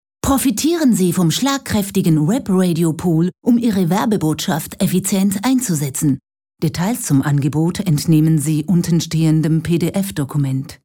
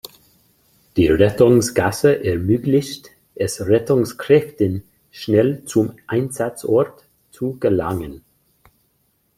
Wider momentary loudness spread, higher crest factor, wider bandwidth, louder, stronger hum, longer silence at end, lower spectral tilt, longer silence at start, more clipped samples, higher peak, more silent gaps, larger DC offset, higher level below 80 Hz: second, 5 LU vs 13 LU; about the same, 14 dB vs 18 dB; first, 18.5 kHz vs 16 kHz; about the same, -17 LUFS vs -18 LUFS; neither; second, 0.1 s vs 1.2 s; about the same, -6 dB/octave vs -6 dB/octave; second, 0.25 s vs 0.95 s; neither; about the same, -2 dBFS vs 0 dBFS; neither; neither; about the same, -44 dBFS vs -46 dBFS